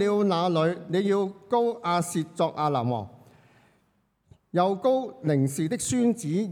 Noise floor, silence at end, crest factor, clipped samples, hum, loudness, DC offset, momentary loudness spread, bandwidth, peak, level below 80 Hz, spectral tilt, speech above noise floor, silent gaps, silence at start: -69 dBFS; 0 s; 16 dB; under 0.1%; none; -26 LUFS; under 0.1%; 5 LU; 18 kHz; -10 dBFS; -68 dBFS; -6 dB/octave; 44 dB; none; 0 s